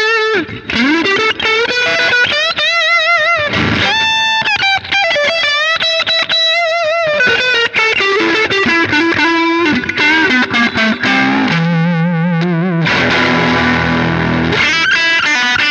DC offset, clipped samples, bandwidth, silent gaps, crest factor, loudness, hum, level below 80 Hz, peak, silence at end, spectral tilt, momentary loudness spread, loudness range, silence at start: under 0.1%; under 0.1%; 8.8 kHz; none; 12 dB; -11 LUFS; none; -44 dBFS; 0 dBFS; 0 s; -4 dB/octave; 4 LU; 1 LU; 0 s